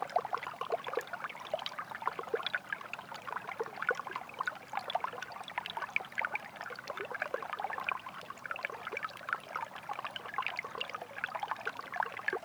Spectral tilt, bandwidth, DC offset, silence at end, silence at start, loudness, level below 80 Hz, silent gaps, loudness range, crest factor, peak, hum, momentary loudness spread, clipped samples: -2.5 dB/octave; over 20 kHz; under 0.1%; 0 s; 0 s; -39 LUFS; -80 dBFS; none; 1 LU; 24 dB; -16 dBFS; none; 6 LU; under 0.1%